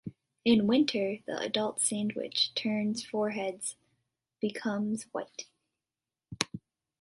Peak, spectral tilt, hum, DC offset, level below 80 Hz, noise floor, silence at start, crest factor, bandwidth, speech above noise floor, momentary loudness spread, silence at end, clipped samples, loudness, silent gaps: -6 dBFS; -3.5 dB/octave; none; under 0.1%; -68 dBFS; under -90 dBFS; 0.05 s; 26 dB; 11.5 kHz; over 60 dB; 14 LU; 0.45 s; under 0.1%; -31 LUFS; none